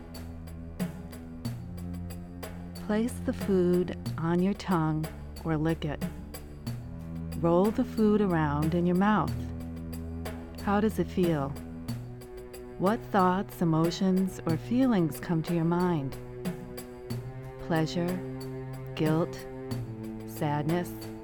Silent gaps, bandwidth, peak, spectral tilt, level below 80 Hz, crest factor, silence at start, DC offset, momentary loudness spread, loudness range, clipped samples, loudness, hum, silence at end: none; 19 kHz; -10 dBFS; -7.5 dB/octave; -48 dBFS; 18 dB; 0 s; under 0.1%; 15 LU; 5 LU; under 0.1%; -30 LUFS; none; 0 s